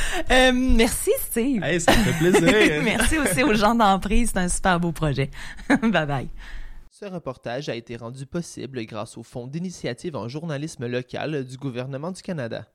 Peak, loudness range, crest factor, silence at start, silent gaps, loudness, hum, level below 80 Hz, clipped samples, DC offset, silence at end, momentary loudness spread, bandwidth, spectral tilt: -6 dBFS; 13 LU; 18 dB; 0 s; none; -22 LUFS; none; -32 dBFS; under 0.1%; under 0.1%; 0.1 s; 16 LU; 16 kHz; -4.5 dB/octave